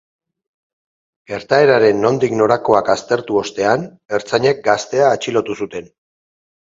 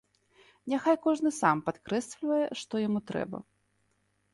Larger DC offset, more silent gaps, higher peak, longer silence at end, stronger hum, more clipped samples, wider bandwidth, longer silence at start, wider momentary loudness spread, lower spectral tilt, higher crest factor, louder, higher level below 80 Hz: neither; first, 4.05-4.09 s vs none; first, 0 dBFS vs -10 dBFS; about the same, 0.85 s vs 0.9 s; second, none vs 50 Hz at -60 dBFS; neither; second, 7.8 kHz vs 11.5 kHz; first, 1.3 s vs 0.65 s; first, 12 LU vs 9 LU; about the same, -5 dB/octave vs -5.5 dB/octave; about the same, 16 dB vs 20 dB; first, -16 LUFS vs -30 LUFS; first, -56 dBFS vs -70 dBFS